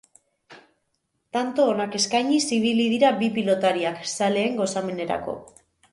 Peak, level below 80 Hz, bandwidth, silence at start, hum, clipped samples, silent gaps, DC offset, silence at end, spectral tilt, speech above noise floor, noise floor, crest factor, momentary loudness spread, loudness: -8 dBFS; -64 dBFS; 11.5 kHz; 0.5 s; none; under 0.1%; none; under 0.1%; 0.5 s; -4 dB/octave; 52 dB; -74 dBFS; 18 dB; 8 LU; -23 LUFS